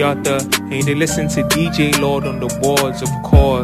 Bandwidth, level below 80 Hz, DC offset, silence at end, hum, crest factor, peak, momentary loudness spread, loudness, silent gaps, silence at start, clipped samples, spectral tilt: 15 kHz; -24 dBFS; under 0.1%; 0 s; none; 16 dB; 0 dBFS; 6 LU; -16 LUFS; none; 0 s; under 0.1%; -4.5 dB/octave